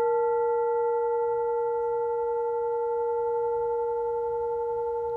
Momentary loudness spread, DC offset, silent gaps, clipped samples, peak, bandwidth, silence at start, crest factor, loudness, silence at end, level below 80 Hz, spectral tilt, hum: 4 LU; under 0.1%; none; under 0.1%; -18 dBFS; 2.1 kHz; 0 s; 10 dB; -27 LUFS; 0 s; -60 dBFS; -7.5 dB/octave; none